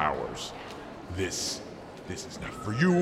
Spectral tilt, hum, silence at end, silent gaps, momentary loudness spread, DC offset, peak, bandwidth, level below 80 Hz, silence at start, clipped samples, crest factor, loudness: -4.5 dB/octave; none; 0 s; none; 14 LU; under 0.1%; -10 dBFS; 14.5 kHz; -54 dBFS; 0 s; under 0.1%; 20 dB; -33 LUFS